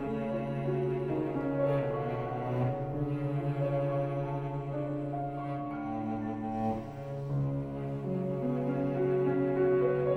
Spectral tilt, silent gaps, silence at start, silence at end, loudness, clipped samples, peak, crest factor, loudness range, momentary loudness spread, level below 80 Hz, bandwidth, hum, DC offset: -10 dB/octave; none; 0 s; 0 s; -33 LUFS; under 0.1%; -18 dBFS; 14 dB; 3 LU; 7 LU; -56 dBFS; 4.6 kHz; none; under 0.1%